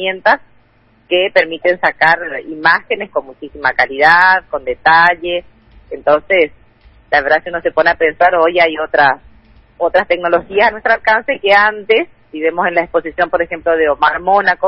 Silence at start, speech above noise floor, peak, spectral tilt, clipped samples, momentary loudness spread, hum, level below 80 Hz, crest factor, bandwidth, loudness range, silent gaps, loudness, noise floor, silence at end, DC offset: 0 s; 38 dB; 0 dBFS; -5.5 dB/octave; under 0.1%; 9 LU; none; -46 dBFS; 14 dB; 8.2 kHz; 2 LU; none; -13 LUFS; -51 dBFS; 0 s; under 0.1%